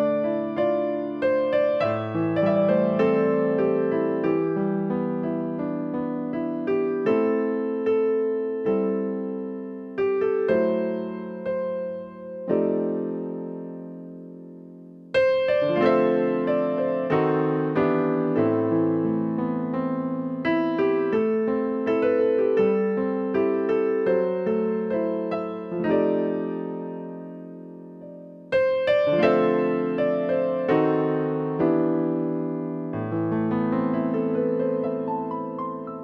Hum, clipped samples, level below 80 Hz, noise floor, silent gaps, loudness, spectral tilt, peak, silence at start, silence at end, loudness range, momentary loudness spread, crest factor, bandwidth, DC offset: none; under 0.1%; -64 dBFS; -44 dBFS; none; -24 LUFS; -9.5 dB/octave; -6 dBFS; 0 s; 0 s; 5 LU; 12 LU; 18 dB; 5.8 kHz; under 0.1%